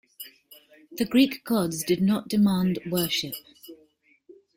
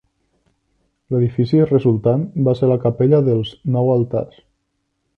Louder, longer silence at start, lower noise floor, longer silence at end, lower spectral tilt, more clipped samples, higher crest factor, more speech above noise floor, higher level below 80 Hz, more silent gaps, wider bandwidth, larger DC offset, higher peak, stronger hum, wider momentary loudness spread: second, -25 LUFS vs -17 LUFS; second, 0.2 s vs 1.1 s; second, -62 dBFS vs -71 dBFS; second, 0.25 s vs 0.9 s; second, -5 dB/octave vs -11 dB/octave; neither; about the same, 18 dB vs 16 dB; second, 38 dB vs 55 dB; second, -62 dBFS vs -52 dBFS; neither; first, 17 kHz vs 5.2 kHz; neither; second, -8 dBFS vs -2 dBFS; neither; first, 21 LU vs 8 LU